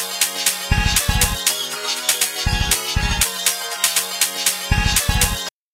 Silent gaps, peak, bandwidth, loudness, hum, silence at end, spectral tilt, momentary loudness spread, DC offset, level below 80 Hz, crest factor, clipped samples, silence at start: none; 0 dBFS; 16.5 kHz; -18 LUFS; none; 0.25 s; -1.5 dB/octave; 3 LU; under 0.1%; -26 dBFS; 20 dB; under 0.1%; 0 s